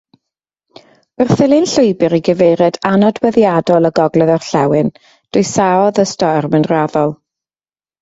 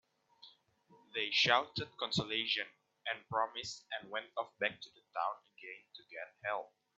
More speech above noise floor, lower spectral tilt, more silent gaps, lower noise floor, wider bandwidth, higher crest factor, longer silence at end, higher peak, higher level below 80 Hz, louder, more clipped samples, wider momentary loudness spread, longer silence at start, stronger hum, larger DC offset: first, over 78 dB vs 30 dB; first, -6 dB/octave vs -0.5 dB/octave; neither; first, under -90 dBFS vs -68 dBFS; about the same, 8 kHz vs 8 kHz; second, 14 dB vs 26 dB; first, 0.85 s vs 0.3 s; first, 0 dBFS vs -12 dBFS; first, -52 dBFS vs -74 dBFS; first, -13 LUFS vs -37 LUFS; neither; second, 5 LU vs 19 LU; first, 1.2 s vs 0.45 s; neither; neither